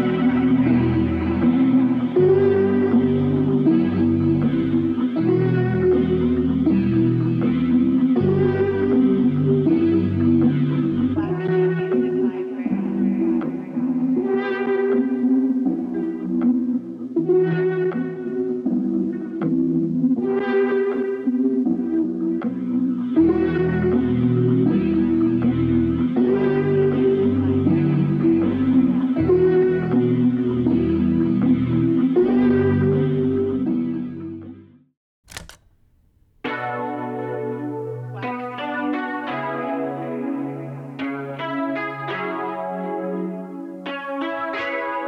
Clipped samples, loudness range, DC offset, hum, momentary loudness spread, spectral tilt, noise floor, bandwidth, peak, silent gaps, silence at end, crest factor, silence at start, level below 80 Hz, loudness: under 0.1%; 9 LU; under 0.1%; none; 10 LU; -9.5 dB/octave; -58 dBFS; 5.4 kHz; -6 dBFS; 34.97-35.23 s; 0 s; 12 dB; 0 s; -50 dBFS; -20 LUFS